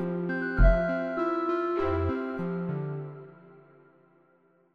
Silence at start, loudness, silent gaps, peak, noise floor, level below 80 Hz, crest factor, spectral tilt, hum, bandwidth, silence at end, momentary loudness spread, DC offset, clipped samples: 0 s; -29 LUFS; none; -10 dBFS; -65 dBFS; -34 dBFS; 20 dB; -9.5 dB/octave; none; 5 kHz; 1.2 s; 14 LU; under 0.1%; under 0.1%